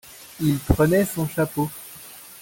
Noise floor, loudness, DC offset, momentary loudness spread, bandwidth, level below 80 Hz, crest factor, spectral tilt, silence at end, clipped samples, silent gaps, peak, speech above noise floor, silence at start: -42 dBFS; -22 LUFS; under 0.1%; 20 LU; 17 kHz; -38 dBFS; 20 dB; -6.5 dB/octave; 0 s; under 0.1%; none; -4 dBFS; 21 dB; 0.05 s